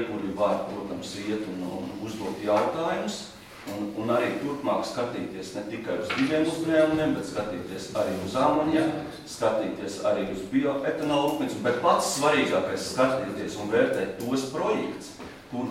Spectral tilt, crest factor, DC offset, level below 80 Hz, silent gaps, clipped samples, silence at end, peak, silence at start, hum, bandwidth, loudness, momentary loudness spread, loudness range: -5 dB/octave; 18 dB; under 0.1%; -58 dBFS; none; under 0.1%; 0 s; -8 dBFS; 0 s; none; 16.5 kHz; -27 LUFS; 12 LU; 5 LU